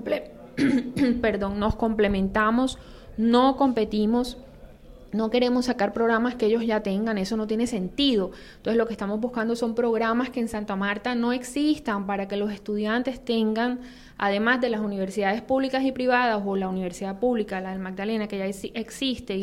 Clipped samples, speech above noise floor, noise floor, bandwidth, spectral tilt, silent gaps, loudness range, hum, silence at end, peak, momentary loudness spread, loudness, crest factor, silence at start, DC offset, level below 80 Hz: under 0.1%; 21 dB; -46 dBFS; 13.5 kHz; -5.5 dB/octave; none; 3 LU; none; 0 s; -8 dBFS; 8 LU; -25 LUFS; 18 dB; 0 s; under 0.1%; -46 dBFS